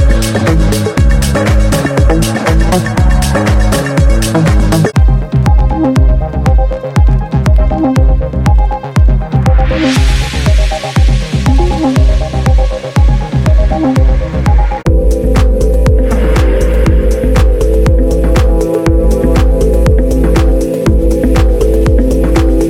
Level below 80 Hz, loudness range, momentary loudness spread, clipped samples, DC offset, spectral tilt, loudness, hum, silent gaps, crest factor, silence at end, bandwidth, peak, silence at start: -10 dBFS; 1 LU; 2 LU; under 0.1%; under 0.1%; -6.5 dB/octave; -11 LUFS; none; none; 8 dB; 0 s; 14 kHz; 0 dBFS; 0 s